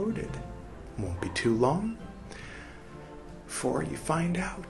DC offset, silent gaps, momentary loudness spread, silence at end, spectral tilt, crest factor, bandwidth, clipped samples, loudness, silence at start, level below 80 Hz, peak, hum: under 0.1%; none; 20 LU; 0 s; -5.5 dB/octave; 22 dB; 12.5 kHz; under 0.1%; -31 LUFS; 0 s; -48 dBFS; -10 dBFS; none